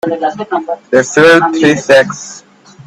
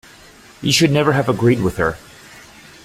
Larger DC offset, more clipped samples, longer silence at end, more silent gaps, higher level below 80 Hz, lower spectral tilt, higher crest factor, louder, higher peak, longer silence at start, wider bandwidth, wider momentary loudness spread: neither; neither; second, 0.05 s vs 0.45 s; neither; second, -52 dBFS vs -44 dBFS; about the same, -4 dB/octave vs -5 dB/octave; second, 10 dB vs 18 dB; first, -10 LUFS vs -16 LUFS; about the same, 0 dBFS vs -2 dBFS; second, 0.05 s vs 0.6 s; second, 13 kHz vs 16 kHz; first, 12 LU vs 9 LU